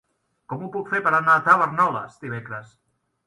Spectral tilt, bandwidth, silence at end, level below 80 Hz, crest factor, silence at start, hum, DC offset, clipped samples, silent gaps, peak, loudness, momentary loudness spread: -6.5 dB/octave; 11.5 kHz; 0.6 s; -68 dBFS; 20 dB; 0.5 s; none; under 0.1%; under 0.1%; none; -2 dBFS; -20 LUFS; 19 LU